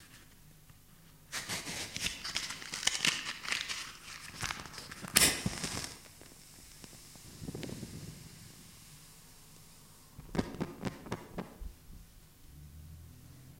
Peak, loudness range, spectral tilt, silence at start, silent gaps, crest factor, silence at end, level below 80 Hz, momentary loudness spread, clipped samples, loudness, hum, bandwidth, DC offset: 0 dBFS; 16 LU; -1.5 dB/octave; 0 s; none; 40 dB; 0 s; -56 dBFS; 25 LU; under 0.1%; -35 LUFS; none; 16.5 kHz; under 0.1%